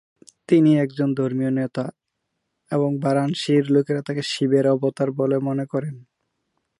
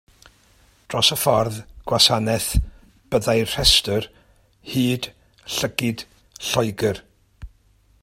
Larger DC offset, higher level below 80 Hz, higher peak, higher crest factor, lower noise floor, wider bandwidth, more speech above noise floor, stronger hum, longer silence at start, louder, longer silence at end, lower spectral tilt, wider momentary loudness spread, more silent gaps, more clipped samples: neither; second, -70 dBFS vs -36 dBFS; second, -6 dBFS vs 0 dBFS; second, 16 dB vs 22 dB; first, -77 dBFS vs -58 dBFS; second, 11.5 kHz vs 16.5 kHz; first, 57 dB vs 37 dB; neither; second, 0.5 s vs 0.9 s; about the same, -21 LUFS vs -20 LUFS; first, 0.8 s vs 0.55 s; first, -7 dB/octave vs -3.5 dB/octave; second, 9 LU vs 18 LU; neither; neither